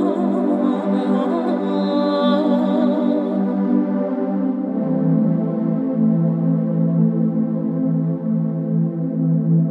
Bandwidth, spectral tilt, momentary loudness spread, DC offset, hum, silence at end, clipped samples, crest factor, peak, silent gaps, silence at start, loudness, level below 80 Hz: 4.4 kHz; -10 dB/octave; 4 LU; under 0.1%; none; 0 s; under 0.1%; 14 dB; -4 dBFS; none; 0 s; -19 LUFS; -74 dBFS